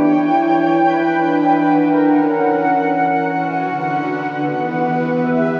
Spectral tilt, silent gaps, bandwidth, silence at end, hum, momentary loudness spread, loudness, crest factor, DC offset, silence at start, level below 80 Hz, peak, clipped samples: -8.5 dB/octave; none; 6.2 kHz; 0 s; none; 6 LU; -16 LUFS; 12 dB; under 0.1%; 0 s; -72 dBFS; -4 dBFS; under 0.1%